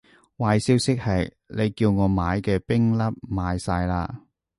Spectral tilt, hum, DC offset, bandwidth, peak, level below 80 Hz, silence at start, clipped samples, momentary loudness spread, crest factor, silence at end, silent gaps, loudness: -6.5 dB/octave; none; under 0.1%; 11.5 kHz; -6 dBFS; -40 dBFS; 0.4 s; under 0.1%; 8 LU; 18 dB; 0.4 s; none; -24 LUFS